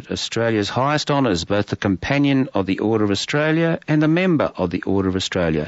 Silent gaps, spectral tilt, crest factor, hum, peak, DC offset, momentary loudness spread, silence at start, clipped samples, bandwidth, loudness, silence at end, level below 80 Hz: none; -5.5 dB/octave; 14 dB; none; -6 dBFS; under 0.1%; 4 LU; 0 s; under 0.1%; 8 kHz; -19 LUFS; 0 s; -46 dBFS